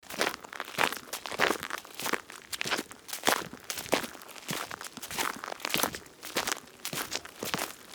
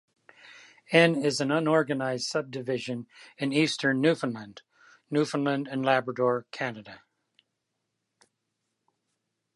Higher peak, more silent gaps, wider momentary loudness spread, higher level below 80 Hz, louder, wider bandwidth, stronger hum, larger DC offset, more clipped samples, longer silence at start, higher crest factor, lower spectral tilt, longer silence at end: about the same, -4 dBFS vs -6 dBFS; neither; about the same, 10 LU vs 12 LU; first, -66 dBFS vs -78 dBFS; second, -33 LUFS vs -27 LUFS; first, over 20 kHz vs 11.5 kHz; neither; neither; neither; second, 0.05 s vs 0.45 s; first, 30 dB vs 24 dB; second, -1.5 dB/octave vs -5 dB/octave; second, 0 s vs 2.6 s